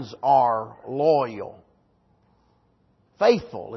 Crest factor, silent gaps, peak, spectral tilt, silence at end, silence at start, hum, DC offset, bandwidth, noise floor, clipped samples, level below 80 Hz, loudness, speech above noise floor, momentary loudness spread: 20 dB; none; -4 dBFS; -6.5 dB/octave; 0 s; 0 s; none; under 0.1%; 6.2 kHz; -64 dBFS; under 0.1%; -64 dBFS; -22 LUFS; 41 dB; 14 LU